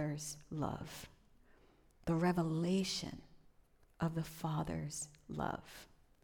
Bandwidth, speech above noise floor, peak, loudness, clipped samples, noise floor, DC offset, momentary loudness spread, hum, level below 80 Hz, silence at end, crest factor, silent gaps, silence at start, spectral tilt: 18.5 kHz; 29 dB; -24 dBFS; -40 LUFS; under 0.1%; -68 dBFS; under 0.1%; 16 LU; none; -62 dBFS; 0.4 s; 18 dB; none; 0 s; -5.5 dB/octave